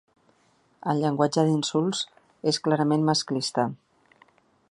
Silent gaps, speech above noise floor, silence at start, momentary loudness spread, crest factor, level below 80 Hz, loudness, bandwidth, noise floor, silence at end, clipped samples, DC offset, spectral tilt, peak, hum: none; 40 dB; 0.85 s; 8 LU; 20 dB; -72 dBFS; -25 LUFS; 11.5 kHz; -64 dBFS; 0.95 s; under 0.1%; under 0.1%; -5 dB/octave; -6 dBFS; none